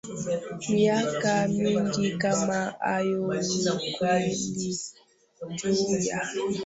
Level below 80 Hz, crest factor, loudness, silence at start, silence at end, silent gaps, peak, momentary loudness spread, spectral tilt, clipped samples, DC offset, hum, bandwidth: -62 dBFS; 16 dB; -27 LUFS; 0.05 s; 0 s; none; -10 dBFS; 7 LU; -4.5 dB/octave; under 0.1%; under 0.1%; none; 8.2 kHz